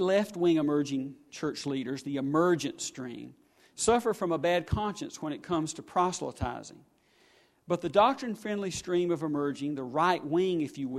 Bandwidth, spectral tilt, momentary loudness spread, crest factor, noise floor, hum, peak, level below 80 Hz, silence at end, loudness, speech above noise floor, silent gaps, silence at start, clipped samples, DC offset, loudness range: 13.5 kHz; -5 dB/octave; 11 LU; 20 dB; -64 dBFS; none; -10 dBFS; -54 dBFS; 0 s; -30 LUFS; 34 dB; none; 0 s; under 0.1%; under 0.1%; 3 LU